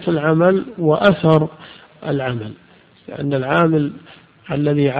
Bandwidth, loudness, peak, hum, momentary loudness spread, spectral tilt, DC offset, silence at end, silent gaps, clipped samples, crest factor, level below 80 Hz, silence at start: 5 kHz; -17 LUFS; 0 dBFS; none; 13 LU; -9.5 dB/octave; under 0.1%; 0 s; none; under 0.1%; 18 dB; -52 dBFS; 0 s